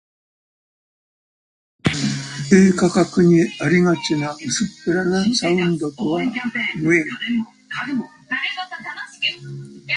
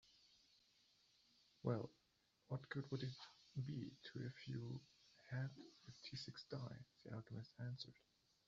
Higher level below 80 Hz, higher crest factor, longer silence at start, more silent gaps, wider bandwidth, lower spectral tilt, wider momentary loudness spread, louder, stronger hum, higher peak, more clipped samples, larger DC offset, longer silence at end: first, -52 dBFS vs -82 dBFS; second, 18 dB vs 24 dB; first, 1.85 s vs 0.05 s; neither; first, 10.5 kHz vs 7.4 kHz; about the same, -5 dB/octave vs -6 dB/octave; first, 13 LU vs 10 LU; first, -19 LUFS vs -52 LUFS; neither; first, -2 dBFS vs -30 dBFS; neither; neither; second, 0 s vs 0.55 s